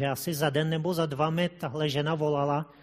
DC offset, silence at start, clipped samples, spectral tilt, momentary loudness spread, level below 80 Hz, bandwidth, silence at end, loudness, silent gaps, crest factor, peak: under 0.1%; 0 s; under 0.1%; -5.5 dB/octave; 3 LU; -64 dBFS; 15.5 kHz; 0.15 s; -28 LUFS; none; 16 dB; -12 dBFS